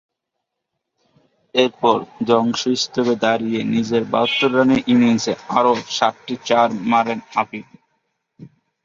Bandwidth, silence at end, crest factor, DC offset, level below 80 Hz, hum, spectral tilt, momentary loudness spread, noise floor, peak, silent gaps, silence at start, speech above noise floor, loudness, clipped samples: 7.6 kHz; 0.35 s; 18 dB; under 0.1%; -60 dBFS; none; -4.5 dB/octave; 7 LU; -79 dBFS; -2 dBFS; none; 1.55 s; 61 dB; -18 LUFS; under 0.1%